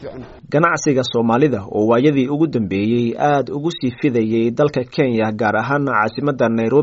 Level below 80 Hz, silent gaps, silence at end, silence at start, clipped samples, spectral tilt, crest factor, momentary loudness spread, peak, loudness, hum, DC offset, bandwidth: -52 dBFS; none; 0 s; 0 s; under 0.1%; -5.5 dB/octave; 16 dB; 5 LU; -2 dBFS; -17 LUFS; none; under 0.1%; 7.8 kHz